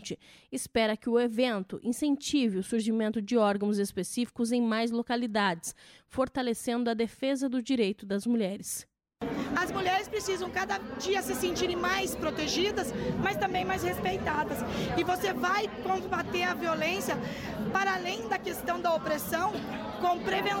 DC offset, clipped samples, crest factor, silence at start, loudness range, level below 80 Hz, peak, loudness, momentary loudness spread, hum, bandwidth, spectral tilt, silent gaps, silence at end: under 0.1%; under 0.1%; 16 dB; 0 s; 2 LU; -56 dBFS; -14 dBFS; -30 LUFS; 5 LU; none; 16.5 kHz; -4 dB/octave; none; 0 s